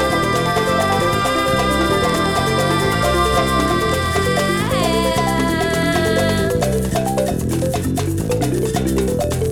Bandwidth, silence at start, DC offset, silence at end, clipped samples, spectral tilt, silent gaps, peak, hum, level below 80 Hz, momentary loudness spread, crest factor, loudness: 19.5 kHz; 0 s; under 0.1%; 0 s; under 0.1%; -5 dB/octave; none; -6 dBFS; none; -30 dBFS; 3 LU; 12 dB; -17 LUFS